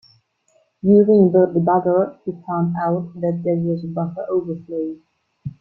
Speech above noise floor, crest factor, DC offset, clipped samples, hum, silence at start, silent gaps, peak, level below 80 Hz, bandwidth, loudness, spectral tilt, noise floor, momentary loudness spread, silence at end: 44 dB; 16 dB; under 0.1%; under 0.1%; none; 0.85 s; none; -2 dBFS; -60 dBFS; 5.8 kHz; -19 LUFS; -12 dB/octave; -62 dBFS; 15 LU; 0.1 s